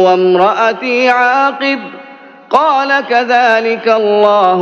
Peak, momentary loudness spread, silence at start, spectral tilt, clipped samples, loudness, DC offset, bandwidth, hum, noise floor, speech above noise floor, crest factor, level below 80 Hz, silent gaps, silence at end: 0 dBFS; 6 LU; 0 s; -5 dB/octave; 0.1%; -11 LUFS; under 0.1%; 7.6 kHz; none; -35 dBFS; 25 dB; 10 dB; -64 dBFS; none; 0 s